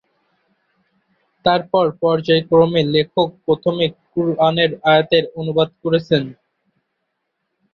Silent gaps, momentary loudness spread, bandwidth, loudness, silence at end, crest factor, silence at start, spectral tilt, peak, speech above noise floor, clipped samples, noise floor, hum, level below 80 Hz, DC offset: none; 7 LU; 6.4 kHz; -17 LUFS; 1.4 s; 18 dB; 1.45 s; -7.5 dB/octave; -2 dBFS; 57 dB; under 0.1%; -74 dBFS; none; -56 dBFS; under 0.1%